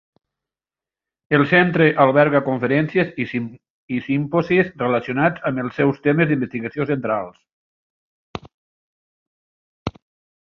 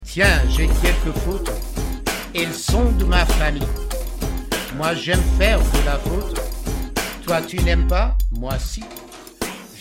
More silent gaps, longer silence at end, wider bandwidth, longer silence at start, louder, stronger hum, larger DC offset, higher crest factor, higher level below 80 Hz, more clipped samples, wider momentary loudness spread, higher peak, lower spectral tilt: first, 3.70-3.88 s, 7.53-8.34 s, 8.54-9.86 s vs none; first, 0.55 s vs 0 s; second, 6.6 kHz vs 16.5 kHz; first, 1.3 s vs 0 s; about the same, -19 LUFS vs -21 LUFS; neither; neither; about the same, 20 dB vs 18 dB; second, -54 dBFS vs -20 dBFS; neither; first, 18 LU vs 11 LU; about the same, -2 dBFS vs -2 dBFS; first, -8.5 dB/octave vs -4.5 dB/octave